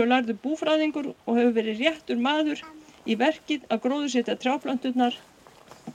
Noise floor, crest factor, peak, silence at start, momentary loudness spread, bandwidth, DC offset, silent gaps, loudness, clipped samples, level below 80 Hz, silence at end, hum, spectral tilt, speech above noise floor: -51 dBFS; 18 dB; -6 dBFS; 0 s; 9 LU; 9.4 kHz; under 0.1%; none; -26 LUFS; under 0.1%; -70 dBFS; 0 s; none; -4 dB/octave; 26 dB